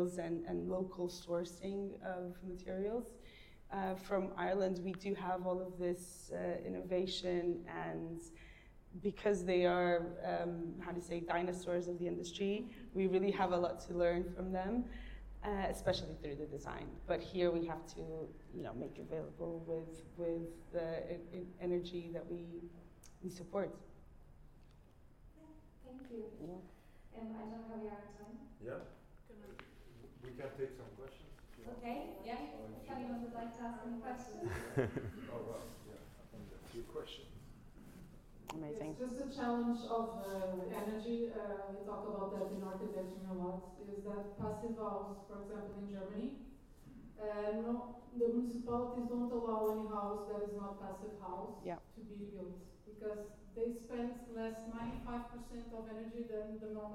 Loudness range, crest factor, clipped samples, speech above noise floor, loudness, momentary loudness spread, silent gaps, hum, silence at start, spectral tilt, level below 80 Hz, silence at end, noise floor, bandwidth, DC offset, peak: 13 LU; 22 dB; under 0.1%; 21 dB; -42 LUFS; 19 LU; none; none; 0 s; -6.5 dB/octave; -60 dBFS; 0 s; -62 dBFS; 16 kHz; under 0.1%; -20 dBFS